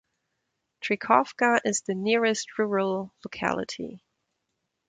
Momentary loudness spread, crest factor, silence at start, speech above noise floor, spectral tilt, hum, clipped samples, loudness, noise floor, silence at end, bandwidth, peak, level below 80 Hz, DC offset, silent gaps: 13 LU; 22 dB; 0.8 s; 54 dB; -3.5 dB/octave; none; under 0.1%; -26 LUFS; -80 dBFS; 0.9 s; 9.6 kHz; -6 dBFS; -68 dBFS; under 0.1%; none